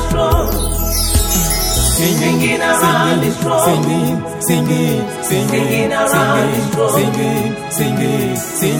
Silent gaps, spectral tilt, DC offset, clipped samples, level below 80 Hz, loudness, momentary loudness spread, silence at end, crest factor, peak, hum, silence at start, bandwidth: none; -4.5 dB/octave; under 0.1%; under 0.1%; -24 dBFS; -14 LUFS; 5 LU; 0 s; 14 dB; 0 dBFS; none; 0 s; 17 kHz